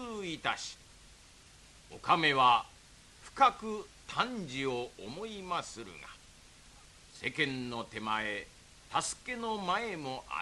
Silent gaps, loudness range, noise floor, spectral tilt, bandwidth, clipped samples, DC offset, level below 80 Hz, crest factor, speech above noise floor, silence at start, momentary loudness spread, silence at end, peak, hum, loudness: none; 8 LU; -58 dBFS; -3 dB/octave; 12.5 kHz; under 0.1%; under 0.1%; -62 dBFS; 22 dB; 24 dB; 0 s; 22 LU; 0 s; -12 dBFS; none; -33 LUFS